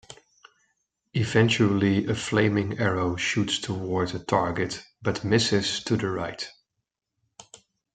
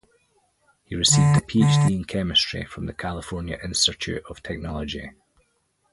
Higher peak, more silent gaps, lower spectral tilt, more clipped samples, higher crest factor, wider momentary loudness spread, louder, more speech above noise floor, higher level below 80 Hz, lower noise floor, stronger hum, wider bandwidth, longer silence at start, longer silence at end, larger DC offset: about the same, -6 dBFS vs -4 dBFS; neither; about the same, -5 dB/octave vs -4 dB/octave; neither; about the same, 20 dB vs 20 dB; second, 10 LU vs 15 LU; second, -25 LUFS vs -22 LUFS; first, 58 dB vs 46 dB; second, -58 dBFS vs -44 dBFS; first, -82 dBFS vs -69 dBFS; neither; second, 9.4 kHz vs 11.5 kHz; second, 0.1 s vs 0.9 s; second, 0.4 s vs 0.85 s; neither